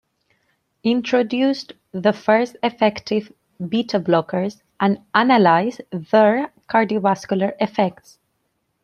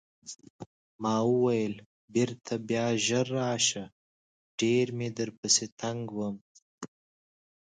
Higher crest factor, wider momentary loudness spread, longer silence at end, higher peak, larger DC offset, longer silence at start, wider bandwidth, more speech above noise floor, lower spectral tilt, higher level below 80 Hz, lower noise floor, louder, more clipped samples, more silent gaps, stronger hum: about the same, 18 dB vs 22 dB; second, 9 LU vs 21 LU; about the same, 0.9 s vs 0.8 s; first, -2 dBFS vs -10 dBFS; neither; first, 0.85 s vs 0.25 s; about the same, 10.5 kHz vs 9.6 kHz; second, 52 dB vs over 61 dB; first, -6.5 dB/octave vs -4 dB/octave; first, -64 dBFS vs -70 dBFS; second, -71 dBFS vs under -90 dBFS; first, -19 LUFS vs -29 LUFS; neither; second, none vs 0.50-0.59 s, 0.66-0.99 s, 1.86-2.08 s, 3.92-4.58 s, 5.38-5.43 s, 5.72-5.77 s, 6.41-6.55 s, 6.62-6.78 s; neither